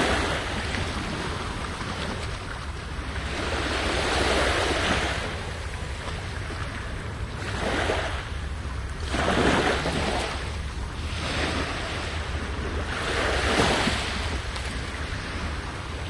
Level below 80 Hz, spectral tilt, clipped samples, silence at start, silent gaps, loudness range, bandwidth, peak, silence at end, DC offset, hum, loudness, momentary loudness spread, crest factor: -34 dBFS; -4 dB/octave; under 0.1%; 0 s; none; 4 LU; 11.5 kHz; -8 dBFS; 0 s; under 0.1%; none; -27 LUFS; 11 LU; 20 dB